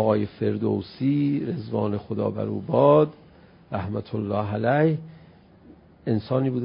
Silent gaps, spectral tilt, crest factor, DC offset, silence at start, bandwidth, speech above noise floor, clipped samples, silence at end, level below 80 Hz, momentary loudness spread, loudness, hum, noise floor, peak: none; -12.5 dB/octave; 20 dB; under 0.1%; 0 s; 5.4 kHz; 28 dB; under 0.1%; 0 s; -54 dBFS; 10 LU; -24 LUFS; none; -51 dBFS; -6 dBFS